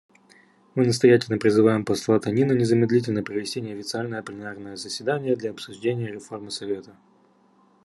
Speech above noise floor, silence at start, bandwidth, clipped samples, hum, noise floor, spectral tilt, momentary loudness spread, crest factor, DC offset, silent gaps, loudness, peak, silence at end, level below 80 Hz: 36 dB; 0.75 s; 12 kHz; under 0.1%; none; -59 dBFS; -6 dB/octave; 15 LU; 20 dB; under 0.1%; none; -23 LUFS; -4 dBFS; 0.95 s; -68 dBFS